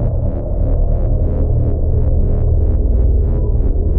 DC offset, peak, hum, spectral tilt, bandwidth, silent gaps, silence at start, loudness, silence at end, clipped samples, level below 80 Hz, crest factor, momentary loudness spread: under 0.1%; -4 dBFS; none; -14 dB/octave; 1.7 kHz; none; 0 s; -17 LUFS; 0 s; under 0.1%; -14 dBFS; 10 dB; 3 LU